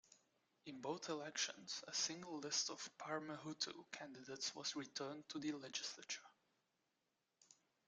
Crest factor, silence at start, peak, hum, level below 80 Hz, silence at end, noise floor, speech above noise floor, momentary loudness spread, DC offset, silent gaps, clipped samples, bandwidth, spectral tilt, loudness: 24 dB; 0.1 s; -26 dBFS; none; under -90 dBFS; 0.35 s; -88 dBFS; 40 dB; 10 LU; under 0.1%; none; under 0.1%; 11 kHz; -1.5 dB/octave; -46 LUFS